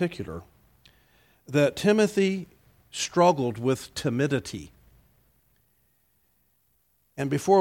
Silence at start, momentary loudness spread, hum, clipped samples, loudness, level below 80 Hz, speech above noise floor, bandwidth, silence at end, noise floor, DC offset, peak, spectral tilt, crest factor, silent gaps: 0 s; 17 LU; none; under 0.1%; -25 LUFS; -60 dBFS; 45 dB; 17 kHz; 0 s; -69 dBFS; under 0.1%; -6 dBFS; -5.5 dB/octave; 20 dB; none